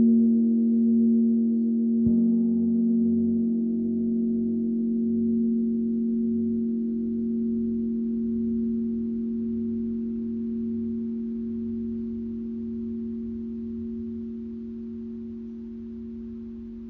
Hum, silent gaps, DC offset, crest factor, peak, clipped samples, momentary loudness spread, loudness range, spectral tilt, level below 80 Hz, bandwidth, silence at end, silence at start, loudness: none; none; under 0.1%; 12 dB; -12 dBFS; under 0.1%; 14 LU; 11 LU; -13 dB/octave; -52 dBFS; 0.9 kHz; 0 s; 0 s; -26 LUFS